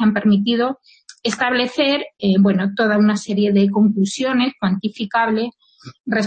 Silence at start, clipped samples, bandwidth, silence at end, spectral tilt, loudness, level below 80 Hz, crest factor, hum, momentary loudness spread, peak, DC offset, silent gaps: 0 s; under 0.1%; 8.8 kHz; 0 s; -6 dB/octave; -18 LUFS; -58 dBFS; 12 dB; none; 8 LU; -6 dBFS; under 0.1%; 6.00-6.04 s